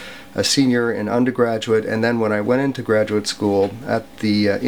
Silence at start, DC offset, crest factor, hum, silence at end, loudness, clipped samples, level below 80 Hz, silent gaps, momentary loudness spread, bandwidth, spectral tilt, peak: 0 s; 0.4%; 14 dB; none; 0 s; -19 LUFS; under 0.1%; -56 dBFS; none; 5 LU; over 20 kHz; -5 dB/octave; -4 dBFS